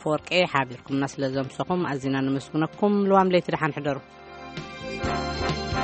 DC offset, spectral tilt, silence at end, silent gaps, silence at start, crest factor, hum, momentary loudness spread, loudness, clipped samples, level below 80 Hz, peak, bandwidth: under 0.1%; -6 dB/octave; 0 s; none; 0 s; 20 dB; none; 15 LU; -25 LUFS; under 0.1%; -46 dBFS; -4 dBFS; 8.4 kHz